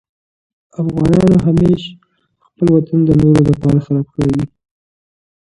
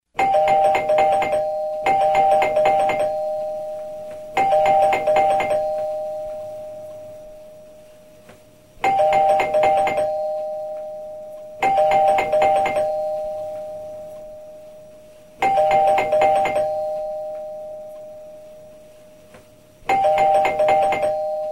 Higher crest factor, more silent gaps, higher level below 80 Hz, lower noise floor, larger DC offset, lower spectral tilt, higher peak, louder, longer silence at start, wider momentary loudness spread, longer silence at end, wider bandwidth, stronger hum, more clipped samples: about the same, 14 dB vs 16 dB; neither; first, -36 dBFS vs -52 dBFS; first, -60 dBFS vs -48 dBFS; second, under 0.1% vs 0.2%; first, -9 dB/octave vs -4 dB/octave; first, 0 dBFS vs -6 dBFS; first, -13 LUFS vs -19 LUFS; first, 0.8 s vs 0.15 s; second, 11 LU vs 19 LU; first, 1.05 s vs 0 s; second, 11 kHz vs 15.5 kHz; neither; neither